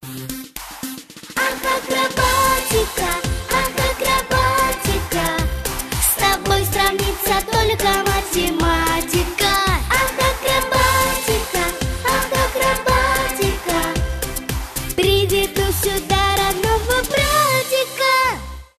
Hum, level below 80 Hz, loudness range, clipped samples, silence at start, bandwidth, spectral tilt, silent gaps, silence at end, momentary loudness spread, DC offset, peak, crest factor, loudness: none; -28 dBFS; 2 LU; under 0.1%; 0 s; 14.5 kHz; -3 dB/octave; none; 0.15 s; 8 LU; under 0.1%; -2 dBFS; 16 dB; -18 LUFS